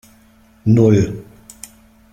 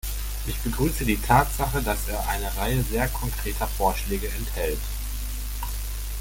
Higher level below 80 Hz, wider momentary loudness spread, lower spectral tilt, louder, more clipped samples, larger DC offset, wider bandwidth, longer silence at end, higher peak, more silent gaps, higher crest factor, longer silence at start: second, -46 dBFS vs -30 dBFS; first, 25 LU vs 11 LU; first, -8.5 dB/octave vs -4.5 dB/octave; first, -15 LUFS vs -26 LUFS; neither; neither; about the same, 15.5 kHz vs 17 kHz; first, 0.9 s vs 0 s; about the same, -2 dBFS vs -4 dBFS; neither; about the same, 16 dB vs 20 dB; first, 0.65 s vs 0.05 s